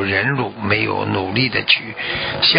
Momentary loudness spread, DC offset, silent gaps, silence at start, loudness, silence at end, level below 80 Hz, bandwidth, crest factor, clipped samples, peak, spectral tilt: 6 LU; under 0.1%; none; 0 s; -18 LUFS; 0 s; -44 dBFS; 5.4 kHz; 18 dB; under 0.1%; 0 dBFS; -9 dB/octave